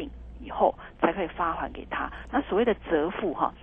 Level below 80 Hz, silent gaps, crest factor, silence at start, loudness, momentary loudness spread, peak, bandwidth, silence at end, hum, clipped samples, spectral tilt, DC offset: -46 dBFS; none; 20 dB; 0 s; -28 LUFS; 8 LU; -8 dBFS; 3.8 kHz; 0 s; none; under 0.1%; -8.5 dB/octave; under 0.1%